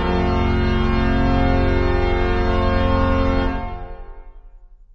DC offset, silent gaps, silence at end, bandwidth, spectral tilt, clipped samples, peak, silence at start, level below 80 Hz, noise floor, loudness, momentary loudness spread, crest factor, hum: under 0.1%; none; 0.3 s; 6.8 kHz; -8 dB/octave; under 0.1%; -4 dBFS; 0 s; -22 dBFS; -43 dBFS; -19 LUFS; 7 LU; 14 dB; none